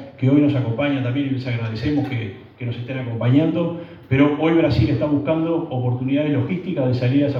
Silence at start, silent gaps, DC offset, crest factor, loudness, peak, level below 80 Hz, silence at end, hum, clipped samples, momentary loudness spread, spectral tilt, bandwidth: 0 s; none; under 0.1%; 16 dB; -20 LUFS; -2 dBFS; -52 dBFS; 0 s; none; under 0.1%; 10 LU; -9.5 dB/octave; 5.8 kHz